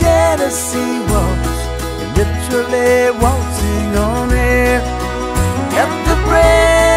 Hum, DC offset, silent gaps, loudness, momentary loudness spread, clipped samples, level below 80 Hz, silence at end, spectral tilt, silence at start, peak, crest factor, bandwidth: none; under 0.1%; none; -14 LUFS; 8 LU; under 0.1%; -20 dBFS; 0 s; -5 dB/octave; 0 s; 0 dBFS; 14 dB; 16 kHz